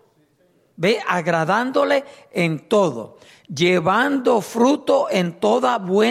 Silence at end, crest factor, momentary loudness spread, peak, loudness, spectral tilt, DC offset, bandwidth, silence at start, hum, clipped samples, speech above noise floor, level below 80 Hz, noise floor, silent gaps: 0 s; 14 dB; 6 LU; -6 dBFS; -19 LUFS; -5.5 dB/octave; under 0.1%; 15 kHz; 0.8 s; none; under 0.1%; 41 dB; -66 dBFS; -60 dBFS; none